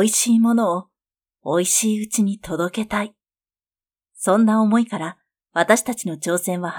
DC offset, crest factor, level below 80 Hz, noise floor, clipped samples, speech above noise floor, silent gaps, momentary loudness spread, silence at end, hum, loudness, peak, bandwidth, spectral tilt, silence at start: under 0.1%; 20 dB; -58 dBFS; under -90 dBFS; under 0.1%; over 71 dB; none; 11 LU; 0 s; none; -20 LUFS; -2 dBFS; 18.5 kHz; -4 dB/octave; 0 s